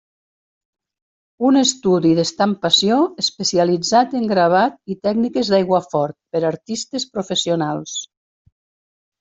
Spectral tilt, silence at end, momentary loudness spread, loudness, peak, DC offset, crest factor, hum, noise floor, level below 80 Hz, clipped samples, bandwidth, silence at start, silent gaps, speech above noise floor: -4 dB/octave; 1.15 s; 9 LU; -18 LUFS; -2 dBFS; under 0.1%; 18 dB; none; under -90 dBFS; -60 dBFS; under 0.1%; 8.2 kHz; 1.4 s; none; over 72 dB